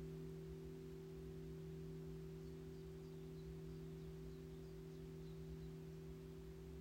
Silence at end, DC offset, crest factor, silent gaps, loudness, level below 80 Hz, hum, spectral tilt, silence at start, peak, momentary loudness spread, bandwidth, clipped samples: 0 s; under 0.1%; 12 dB; none; -54 LUFS; -62 dBFS; none; -7.5 dB/octave; 0 s; -42 dBFS; 2 LU; 16 kHz; under 0.1%